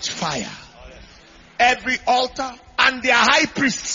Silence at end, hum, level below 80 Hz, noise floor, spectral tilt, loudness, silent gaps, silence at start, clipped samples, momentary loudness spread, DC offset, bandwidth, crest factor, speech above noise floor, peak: 0 s; none; -50 dBFS; -47 dBFS; -2 dB/octave; -18 LUFS; none; 0 s; under 0.1%; 15 LU; under 0.1%; 7.6 kHz; 20 dB; 27 dB; 0 dBFS